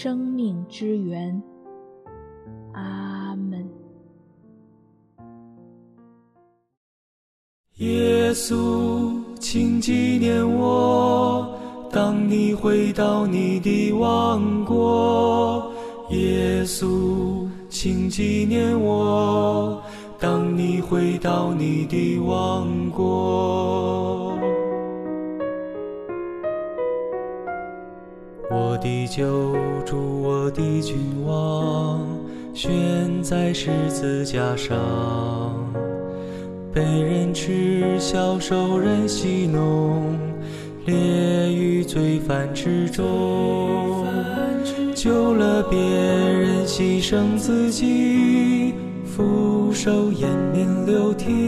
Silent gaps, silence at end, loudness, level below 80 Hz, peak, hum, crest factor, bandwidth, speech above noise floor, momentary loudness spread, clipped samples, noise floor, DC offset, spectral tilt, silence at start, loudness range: 6.77-7.64 s; 0 s; -22 LUFS; -46 dBFS; -8 dBFS; none; 14 dB; 14 kHz; 40 dB; 11 LU; under 0.1%; -60 dBFS; under 0.1%; -6.5 dB/octave; 0 s; 9 LU